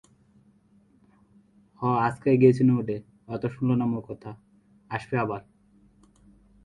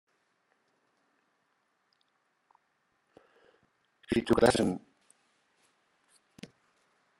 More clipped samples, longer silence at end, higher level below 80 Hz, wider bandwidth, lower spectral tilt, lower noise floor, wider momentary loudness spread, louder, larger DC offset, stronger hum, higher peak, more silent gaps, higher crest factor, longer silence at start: neither; second, 1.25 s vs 2.4 s; about the same, -62 dBFS vs -60 dBFS; second, 9.8 kHz vs 12.5 kHz; first, -9.5 dB/octave vs -5 dB/octave; second, -61 dBFS vs -76 dBFS; second, 18 LU vs 28 LU; first, -25 LUFS vs -28 LUFS; neither; neither; first, -6 dBFS vs -10 dBFS; neither; about the same, 22 dB vs 26 dB; second, 1.8 s vs 4.1 s